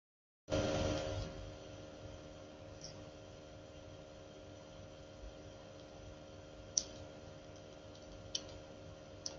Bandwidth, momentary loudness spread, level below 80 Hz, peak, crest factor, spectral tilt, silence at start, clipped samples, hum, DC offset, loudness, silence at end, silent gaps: 9 kHz; 16 LU; -58 dBFS; -12 dBFS; 36 dB; -3.5 dB/octave; 0.5 s; under 0.1%; none; under 0.1%; -46 LUFS; 0 s; none